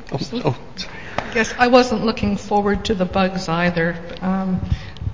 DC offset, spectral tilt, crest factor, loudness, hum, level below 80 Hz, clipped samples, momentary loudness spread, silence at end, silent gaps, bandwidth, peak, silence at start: 1%; -6 dB/octave; 20 dB; -20 LUFS; none; -36 dBFS; under 0.1%; 13 LU; 0 s; none; 7.6 kHz; 0 dBFS; 0 s